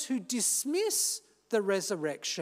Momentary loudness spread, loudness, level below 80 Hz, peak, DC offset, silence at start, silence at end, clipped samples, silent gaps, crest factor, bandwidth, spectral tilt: 6 LU; -30 LUFS; -86 dBFS; -16 dBFS; under 0.1%; 0 s; 0 s; under 0.1%; none; 16 dB; 16 kHz; -2 dB/octave